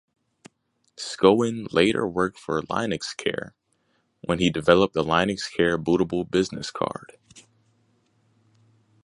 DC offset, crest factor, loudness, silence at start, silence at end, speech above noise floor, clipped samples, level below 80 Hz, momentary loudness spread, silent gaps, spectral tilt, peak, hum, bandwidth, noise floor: under 0.1%; 24 dB; -23 LUFS; 1 s; 1.65 s; 47 dB; under 0.1%; -54 dBFS; 12 LU; none; -5 dB/octave; -2 dBFS; none; 11.5 kHz; -70 dBFS